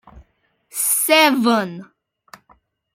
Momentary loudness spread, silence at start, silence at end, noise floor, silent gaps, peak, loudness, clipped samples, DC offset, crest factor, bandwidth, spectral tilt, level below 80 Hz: 18 LU; 0.15 s; 1.1 s; -63 dBFS; none; -2 dBFS; -15 LUFS; under 0.1%; under 0.1%; 18 dB; 16.5 kHz; -2 dB/octave; -58 dBFS